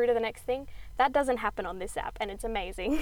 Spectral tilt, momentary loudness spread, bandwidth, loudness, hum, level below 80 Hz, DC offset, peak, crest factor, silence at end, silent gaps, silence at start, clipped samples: -4.5 dB/octave; 9 LU; 19.5 kHz; -31 LUFS; none; -46 dBFS; under 0.1%; -12 dBFS; 18 dB; 0 s; none; 0 s; under 0.1%